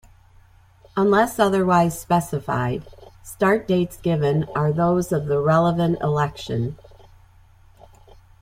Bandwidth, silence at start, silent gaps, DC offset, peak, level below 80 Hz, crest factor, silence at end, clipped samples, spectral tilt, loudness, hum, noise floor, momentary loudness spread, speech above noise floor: 16 kHz; 0.95 s; none; under 0.1%; -4 dBFS; -50 dBFS; 18 dB; 1.65 s; under 0.1%; -6.5 dB/octave; -21 LUFS; none; -52 dBFS; 9 LU; 32 dB